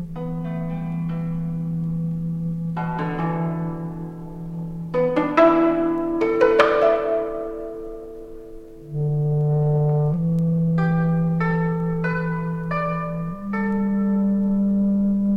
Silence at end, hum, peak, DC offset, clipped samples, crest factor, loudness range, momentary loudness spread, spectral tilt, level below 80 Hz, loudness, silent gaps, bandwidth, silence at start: 0 s; none; -2 dBFS; under 0.1%; under 0.1%; 20 dB; 7 LU; 15 LU; -9.5 dB/octave; -44 dBFS; -22 LUFS; none; 6.2 kHz; 0 s